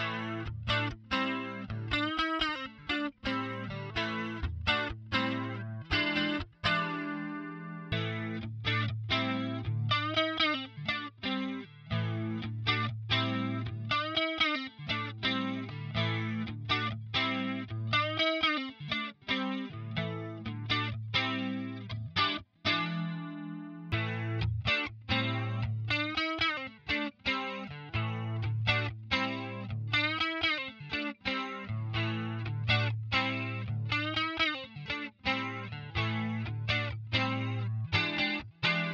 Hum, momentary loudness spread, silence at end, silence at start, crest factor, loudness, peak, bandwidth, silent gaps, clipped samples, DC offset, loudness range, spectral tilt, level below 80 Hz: none; 8 LU; 0 s; 0 s; 20 dB; -32 LUFS; -14 dBFS; 7.6 kHz; none; under 0.1%; under 0.1%; 2 LU; -6 dB/octave; -54 dBFS